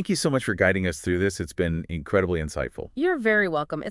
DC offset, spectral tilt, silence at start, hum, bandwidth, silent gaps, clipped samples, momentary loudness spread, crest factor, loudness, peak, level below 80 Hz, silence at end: under 0.1%; -5.5 dB/octave; 0 s; none; 12 kHz; none; under 0.1%; 8 LU; 18 dB; -25 LUFS; -6 dBFS; -46 dBFS; 0 s